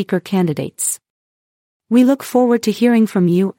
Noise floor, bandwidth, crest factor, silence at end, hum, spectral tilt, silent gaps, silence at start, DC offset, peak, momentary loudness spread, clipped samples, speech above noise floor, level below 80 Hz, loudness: under -90 dBFS; 17 kHz; 14 dB; 0.1 s; none; -5.5 dB/octave; 1.10-1.80 s; 0 s; under 0.1%; -2 dBFS; 7 LU; under 0.1%; over 75 dB; -64 dBFS; -16 LUFS